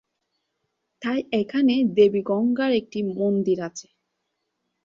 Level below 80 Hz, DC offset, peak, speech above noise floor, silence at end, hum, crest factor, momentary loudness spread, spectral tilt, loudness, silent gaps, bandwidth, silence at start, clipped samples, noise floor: -68 dBFS; under 0.1%; -6 dBFS; 56 dB; 1.05 s; none; 18 dB; 10 LU; -6 dB/octave; -22 LUFS; none; 7.6 kHz; 1 s; under 0.1%; -78 dBFS